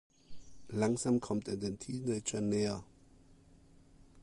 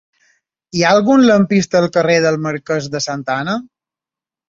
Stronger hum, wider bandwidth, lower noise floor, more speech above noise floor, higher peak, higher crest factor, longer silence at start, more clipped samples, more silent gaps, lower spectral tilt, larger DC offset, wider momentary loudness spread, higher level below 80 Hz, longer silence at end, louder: neither; first, 11.5 kHz vs 7.8 kHz; second, -61 dBFS vs -89 dBFS; second, 27 dB vs 75 dB; second, -18 dBFS vs 0 dBFS; about the same, 18 dB vs 14 dB; second, 0.3 s vs 0.75 s; neither; neither; about the same, -5.5 dB/octave vs -5 dB/octave; neither; second, 7 LU vs 10 LU; second, -62 dBFS vs -56 dBFS; second, 0 s vs 0.85 s; second, -36 LUFS vs -15 LUFS